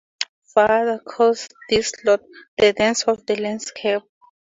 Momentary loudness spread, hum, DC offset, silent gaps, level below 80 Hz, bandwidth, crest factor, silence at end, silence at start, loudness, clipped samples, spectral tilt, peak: 10 LU; none; under 0.1%; 0.29-0.42 s, 2.48-2.57 s; -54 dBFS; 7.8 kHz; 18 dB; 0.5 s; 0.2 s; -20 LUFS; under 0.1%; -3 dB/octave; -2 dBFS